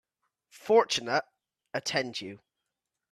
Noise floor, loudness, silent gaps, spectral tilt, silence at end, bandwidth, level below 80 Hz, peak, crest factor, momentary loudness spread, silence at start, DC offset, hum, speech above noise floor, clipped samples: -86 dBFS; -29 LUFS; none; -3 dB/octave; 0.75 s; 13.5 kHz; -74 dBFS; -10 dBFS; 22 dB; 17 LU; 0.65 s; under 0.1%; none; 58 dB; under 0.1%